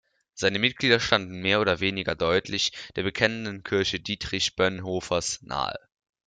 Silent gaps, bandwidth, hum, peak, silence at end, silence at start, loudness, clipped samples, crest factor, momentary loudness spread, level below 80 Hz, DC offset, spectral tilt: none; 9.4 kHz; none; -4 dBFS; 0.5 s; 0.35 s; -25 LUFS; under 0.1%; 22 dB; 8 LU; -54 dBFS; under 0.1%; -3.5 dB/octave